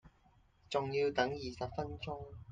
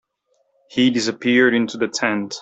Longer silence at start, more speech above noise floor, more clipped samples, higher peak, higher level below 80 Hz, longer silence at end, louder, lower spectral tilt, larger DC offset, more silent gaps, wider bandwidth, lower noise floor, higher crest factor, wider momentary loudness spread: second, 0.05 s vs 0.7 s; second, 31 dB vs 48 dB; neither; second, -18 dBFS vs -2 dBFS; about the same, -62 dBFS vs -64 dBFS; about the same, 0 s vs 0 s; second, -38 LUFS vs -18 LUFS; first, -5.5 dB/octave vs -4 dB/octave; neither; neither; about the same, 9 kHz vs 8.2 kHz; about the same, -68 dBFS vs -67 dBFS; first, 22 dB vs 16 dB; first, 11 LU vs 7 LU